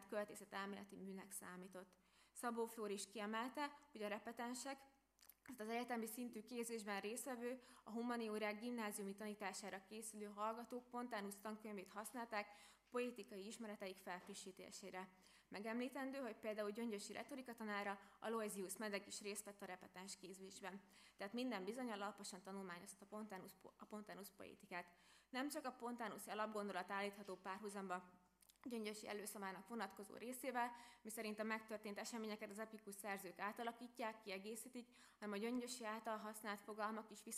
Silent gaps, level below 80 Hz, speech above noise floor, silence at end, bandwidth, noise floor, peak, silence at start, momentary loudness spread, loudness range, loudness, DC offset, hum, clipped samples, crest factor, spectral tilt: none; -88 dBFS; 22 dB; 0 s; 15.5 kHz; -73 dBFS; -30 dBFS; 0 s; 10 LU; 3 LU; -50 LUFS; under 0.1%; none; under 0.1%; 20 dB; -3.5 dB/octave